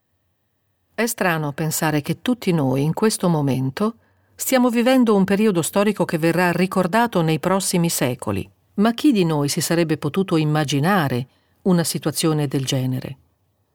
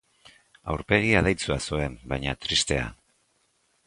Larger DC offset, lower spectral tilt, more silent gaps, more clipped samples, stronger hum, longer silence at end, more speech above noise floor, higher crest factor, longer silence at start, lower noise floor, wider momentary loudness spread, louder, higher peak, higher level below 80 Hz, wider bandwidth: neither; about the same, -5 dB/octave vs -4 dB/octave; neither; neither; neither; second, 0.6 s vs 0.9 s; first, 50 dB vs 44 dB; second, 16 dB vs 24 dB; first, 1 s vs 0.65 s; about the same, -69 dBFS vs -69 dBFS; second, 8 LU vs 12 LU; first, -20 LUFS vs -25 LUFS; about the same, -4 dBFS vs -4 dBFS; second, -60 dBFS vs -42 dBFS; first, 19.5 kHz vs 11.5 kHz